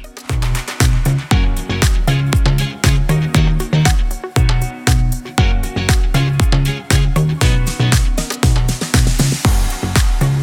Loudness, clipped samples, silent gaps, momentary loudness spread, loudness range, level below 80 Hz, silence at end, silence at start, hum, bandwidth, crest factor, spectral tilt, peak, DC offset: -16 LUFS; under 0.1%; none; 4 LU; 1 LU; -16 dBFS; 0 s; 0 s; none; 17.5 kHz; 12 dB; -5 dB/octave; -2 dBFS; under 0.1%